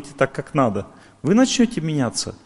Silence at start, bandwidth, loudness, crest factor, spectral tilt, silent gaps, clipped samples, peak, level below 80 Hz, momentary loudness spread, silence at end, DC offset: 0 s; 11.5 kHz; -20 LUFS; 18 dB; -5 dB/octave; none; under 0.1%; -2 dBFS; -50 dBFS; 7 LU; 0.1 s; under 0.1%